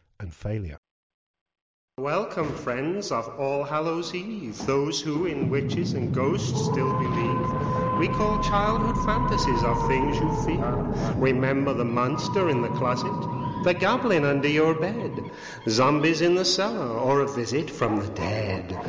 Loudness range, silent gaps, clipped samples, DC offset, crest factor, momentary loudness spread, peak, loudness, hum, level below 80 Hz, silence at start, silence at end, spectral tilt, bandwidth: 6 LU; 0.78-0.83 s, 0.91-1.34 s, 1.41-1.46 s, 1.62-1.88 s; under 0.1%; under 0.1%; 14 dB; 8 LU; -10 dBFS; -25 LUFS; none; -40 dBFS; 0.2 s; 0 s; -6 dB/octave; 8 kHz